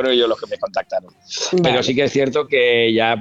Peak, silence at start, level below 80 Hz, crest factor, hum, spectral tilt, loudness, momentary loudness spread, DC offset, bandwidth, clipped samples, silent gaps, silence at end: -2 dBFS; 0 s; -56 dBFS; 16 dB; none; -4 dB/octave; -17 LUFS; 10 LU; under 0.1%; 8 kHz; under 0.1%; none; 0 s